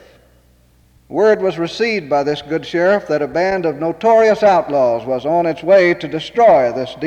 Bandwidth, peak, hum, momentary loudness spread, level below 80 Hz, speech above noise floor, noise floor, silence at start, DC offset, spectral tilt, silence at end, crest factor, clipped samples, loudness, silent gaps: 8.8 kHz; -2 dBFS; none; 8 LU; -52 dBFS; 37 dB; -52 dBFS; 1.1 s; under 0.1%; -6 dB/octave; 0 s; 12 dB; under 0.1%; -15 LUFS; none